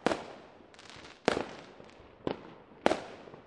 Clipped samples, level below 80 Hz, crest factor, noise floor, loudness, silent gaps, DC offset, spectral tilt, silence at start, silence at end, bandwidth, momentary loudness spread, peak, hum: under 0.1%; -64 dBFS; 32 dB; -54 dBFS; -35 LUFS; none; under 0.1%; -4.5 dB/octave; 0 s; 0.05 s; 11.5 kHz; 21 LU; -4 dBFS; none